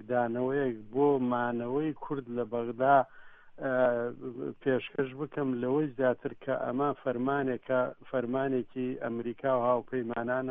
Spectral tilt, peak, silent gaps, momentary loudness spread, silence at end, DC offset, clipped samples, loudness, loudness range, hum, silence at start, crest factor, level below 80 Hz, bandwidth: -10.5 dB/octave; -12 dBFS; none; 8 LU; 0 s; under 0.1%; under 0.1%; -31 LUFS; 2 LU; none; 0 s; 20 dB; -66 dBFS; 3.8 kHz